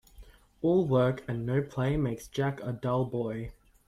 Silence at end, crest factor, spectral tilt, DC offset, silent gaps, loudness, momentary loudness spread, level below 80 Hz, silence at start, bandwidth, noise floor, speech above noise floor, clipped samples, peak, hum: 0.35 s; 16 dB; -8 dB/octave; under 0.1%; none; -30 LUFS; 9 LU; -52 dBFS; 0.2 s; 13.5 kHz; -53 dBFS; 24 dB; under 0.1%; -14 dBFS; none